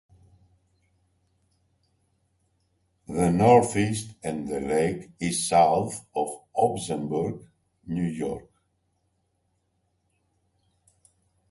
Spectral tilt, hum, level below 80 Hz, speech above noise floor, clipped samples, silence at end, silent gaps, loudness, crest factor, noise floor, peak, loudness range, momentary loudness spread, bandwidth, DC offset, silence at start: -5.5 dB/octave; none; -56 dBFS; 49 dB; under 0.1%; 3.1 s; none; -25 LUFS; 22 dB; -73 dBFS; -6 dBFS; 14 LU; 14 LU; 11.5 kHz; under 0.1%; 3.1 s